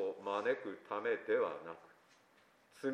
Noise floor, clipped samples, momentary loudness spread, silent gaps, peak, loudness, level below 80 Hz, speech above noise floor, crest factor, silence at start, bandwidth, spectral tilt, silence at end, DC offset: -69 dBFS; under 0.1%; 14 LU; none; -22 dBFS; -39 LUFS; under -90 dBFS; 31 dB; 18 dB; 0 s; 11 kHz; -5.5 dB/octave; 0 s; under 0.1%